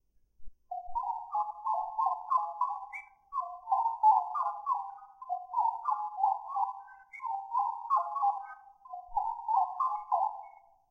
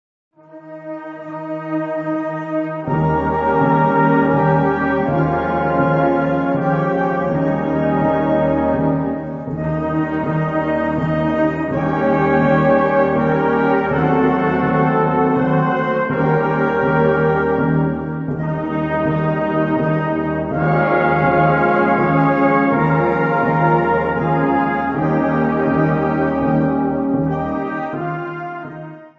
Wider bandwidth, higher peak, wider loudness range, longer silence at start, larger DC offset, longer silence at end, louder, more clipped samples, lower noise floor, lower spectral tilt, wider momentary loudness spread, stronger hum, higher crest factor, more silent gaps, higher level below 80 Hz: first, 6.6 kHz vs 5.8 kHz; second, -16 dBFS vs 0 dBFS; about the same, 3 LU vs 4 LU; about the same, 0.4 s vs 0.5 s; neither; first, 0.4 s vs 0.1 s; second, -32 LUFS vs -17 LUFS; neither; first, -54 dBFS vs -37 dBFS; second, -3 dB/octave vs -10 dB/octave; first, 15 LU vs 8 LU; neither; about the same, 18 dB vs 16 dB; neither; second, -64 dBFS vs -42 dBFS